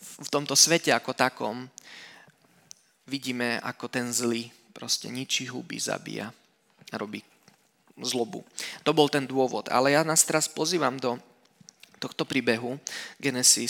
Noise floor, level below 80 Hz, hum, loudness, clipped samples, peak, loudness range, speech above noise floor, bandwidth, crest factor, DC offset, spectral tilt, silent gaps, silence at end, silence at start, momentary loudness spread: -62 dBFS; -80 dBFS; none; -26 LUFS; under 0.1%; -4 dBFS; 8 LU; 35 dB; 17.5 kHz; 24 dB; under 0.1%; -2 dB/octave; none; 0 s; 0 s; 17 LU